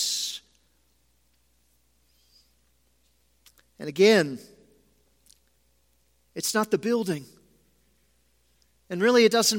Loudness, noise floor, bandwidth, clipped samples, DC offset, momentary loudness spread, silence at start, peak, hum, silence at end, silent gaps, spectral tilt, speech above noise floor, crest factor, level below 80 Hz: -24 LUFS; -68 dBFS; 16.5 kHz; under 0.1%; under 0.1%; 20 LU; 0 s; -6 dBFS; none; 0 s; none; -3 dB/octave; 45 dB; 22 dB; -70 dBFS